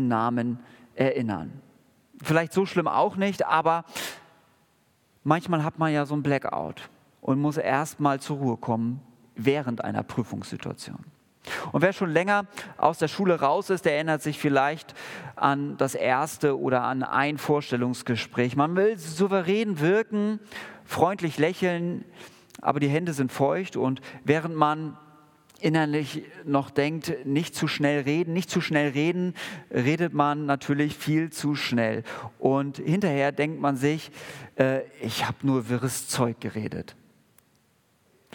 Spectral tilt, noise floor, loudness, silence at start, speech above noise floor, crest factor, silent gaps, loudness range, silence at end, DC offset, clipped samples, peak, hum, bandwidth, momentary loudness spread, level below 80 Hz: -6 dB/octave; -65 dBFS; -26 LUFS; 0 s; 40 dB; 22 dB; none; 3 LU; 1.4 s; under 0.1%; under 0.1%; -4 dBFS; none; 18 kHz; 12 LU; -70 dBFS